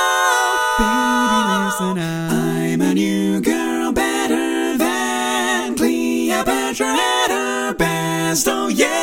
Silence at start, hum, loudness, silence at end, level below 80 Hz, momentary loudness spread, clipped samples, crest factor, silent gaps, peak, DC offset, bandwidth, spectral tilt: 0 s; none; -18 LUFS; 0 s; -42 dBFS; 4 LU; under 0.1%; 16 dB; none; 0 dBFS; under 0.1%; 17 kHz; -3.5 dB/octave